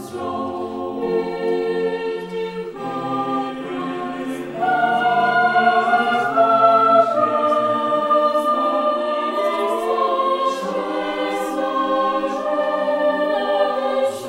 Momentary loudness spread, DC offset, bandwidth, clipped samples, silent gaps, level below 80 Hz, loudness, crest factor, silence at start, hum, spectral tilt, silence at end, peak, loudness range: 11 LU; under 0.1%; 15.5 kHz; under 0.1%; none; -60 dBFS; -19 LUFS; 16 dB; 0 s; none; -5 dB/octave; 0 s; -2 dBFS; 8 LU